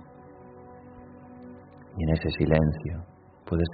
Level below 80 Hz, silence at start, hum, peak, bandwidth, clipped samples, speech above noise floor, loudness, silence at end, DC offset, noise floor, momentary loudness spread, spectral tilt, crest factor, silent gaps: -44 dBFS; 0 s; none; -6 dBFS; 4.8 kHz; under 0.1%; 23 dB; -27 LUFS; 0 s; under 0.1%; -48 dBFS; 25 LU; -7 dB/octave; 24 dB; none